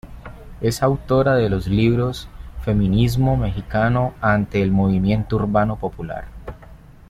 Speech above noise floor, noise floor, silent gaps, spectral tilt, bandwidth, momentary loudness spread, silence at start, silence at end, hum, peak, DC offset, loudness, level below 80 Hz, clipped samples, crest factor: 24 dB; -42 dBFS; none; -7.5 dB/octave; 14.5 kHz; 18 LU; 0.05 s; 0.35 s; none; -4 dBFS; under 0.1%; -19 LUFS; -34 dBFS; under 0.1%; 16 dB